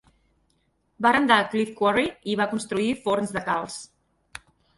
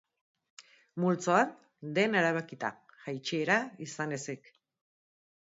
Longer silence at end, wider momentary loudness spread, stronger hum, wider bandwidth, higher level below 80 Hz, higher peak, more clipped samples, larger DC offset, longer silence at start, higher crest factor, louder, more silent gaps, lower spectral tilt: second, 0.95 s vs 1.2 s; first, 22 LU vs 16 LU; neither; first, 11.5 kHz vs 7.8 kHz; first, -60 dBFS vs -82 dBFS; first, -4 dBFS vs -12 dBFS; neither; neither; first, 1 s vs 0.6 s; about the same, 22 dB vs 22 dB; first, -23 LUFS vs -31 LUFS; neither; about the same, -4.5 dB/octave vs -5 dB/octave